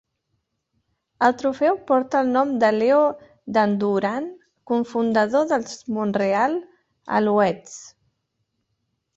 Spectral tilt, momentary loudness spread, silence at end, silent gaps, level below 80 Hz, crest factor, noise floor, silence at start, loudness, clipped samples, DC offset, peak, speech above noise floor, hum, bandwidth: -6 dB/octave; 11 LU; 1.3 s; none; -66 dBFS; 18 dB; -75 dBFS; 1.2 s; -21 LUFS; under 0.1%; under 0.1%; -4 dBFS; 54 dB; none; 8 kHz